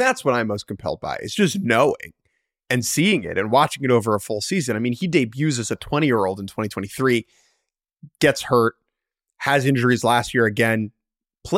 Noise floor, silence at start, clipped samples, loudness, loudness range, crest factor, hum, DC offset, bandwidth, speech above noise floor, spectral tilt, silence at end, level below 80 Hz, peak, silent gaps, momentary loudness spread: -82 dBFS; 0 s; under 0.1%; -21 LUFS; 3 LU; 18 dB; none; under 0.1%; 16.5 kHz; 62 dB; -5 dB/octave; 0 s; -54 dBFS; -4 dBFS; none; 9 LU